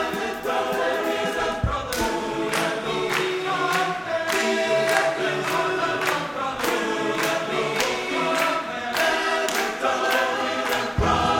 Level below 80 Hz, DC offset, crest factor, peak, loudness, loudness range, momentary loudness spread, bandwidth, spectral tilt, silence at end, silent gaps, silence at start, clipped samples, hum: -42 dBFS; under 0.1%; 18 dB; -6 dBFS; -23 LUFS; 2 LU; 4 LU; 19.5 kHz; -3.5 dB/octave; 0 s; none; 0 s; under 0.1%; none